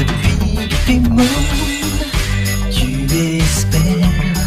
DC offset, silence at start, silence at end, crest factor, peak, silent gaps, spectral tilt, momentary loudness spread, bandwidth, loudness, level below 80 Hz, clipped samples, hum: under 0.1%; 0 s; 0 s; 12 dB; -2 dBFS; none; -5 dB/octave; 5 LU; 15.5 kHz; -15 LUFS; -20 dBFS; under 0.1%; none